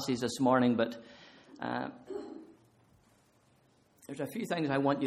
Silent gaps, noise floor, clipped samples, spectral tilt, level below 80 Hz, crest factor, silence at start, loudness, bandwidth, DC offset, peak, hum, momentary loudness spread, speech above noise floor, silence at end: none; -67 dBFS; under 0.1%; -5.5 dB/octave; -72 dBFS; 22 dB; 0 s; -33 LUFS; 14.5 kHz; under 0.1%; -12 dBFS; none; 23 LU; 36 dB; 0 s